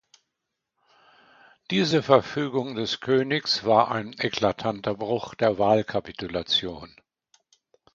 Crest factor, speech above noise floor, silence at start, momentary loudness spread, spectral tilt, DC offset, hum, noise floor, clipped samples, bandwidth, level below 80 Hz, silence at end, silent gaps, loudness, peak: 24 dB; 58 dB; 1.7 s; 10 LU; -5 dB/octave; under 0.1%; none; -83 dBFS; under 0.1%; 7.6 kHz; -58 dBFS; 1.05 s; none; -24 LUFS; -2 dBFS